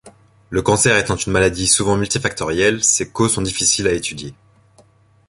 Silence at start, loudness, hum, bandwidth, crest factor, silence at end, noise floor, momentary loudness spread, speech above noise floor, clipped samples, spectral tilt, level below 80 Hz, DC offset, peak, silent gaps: 0.05 s; -16 LUFS; none; 11.5 kHz; 18 dB; 0.95 s; -52 dBFS; 9 LU; 35 dB; under 0.1%; -3 dB/octave; -40 dBFS; under 0.1%; 0 dBFS; none